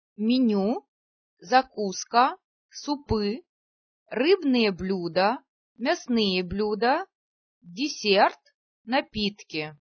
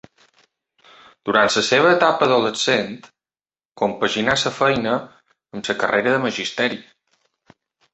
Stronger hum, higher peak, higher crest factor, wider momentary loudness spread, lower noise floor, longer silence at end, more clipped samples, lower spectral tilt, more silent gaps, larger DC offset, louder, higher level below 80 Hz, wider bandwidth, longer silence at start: neither; second, -6 dBFS vs -2 dBFS; about the same, 20 dB vs 20 dB; about the same, 12 LU vs 14 LU; about the same, under -90 dBFS vs under -90 dBFS; second, 0.1 s vs 1.1 s; neither; about the same, -4.5 dB/octave vs -3.5 dB/octave; first, 0.88-1.37 s, 2.44-2.69 s, 3.49-4.06 s, 5.49-5.75 s, 7.15-7.61 s, 8.54-8.85 s vs 3.65-3.69 s; neither; second, -25 LUFS vs -19 LUFS; about the same, -54 dBFS vs -58 dBFS; second, 6.6 kHz vs 8.4 kHz; second, 0.2 s vs 1.25 s